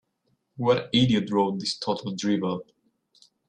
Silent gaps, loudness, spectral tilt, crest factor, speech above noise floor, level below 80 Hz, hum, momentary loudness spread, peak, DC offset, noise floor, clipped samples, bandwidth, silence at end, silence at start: none; -25 LUFS; -5.5 dB/octave; 18 dB; 48 dB; -60 dBFS; none; 8 LU; -8 dBFS; under 0.1%; -73 dBFS; under 0.1%; 10 kHz; 0.85 s; 0.6 s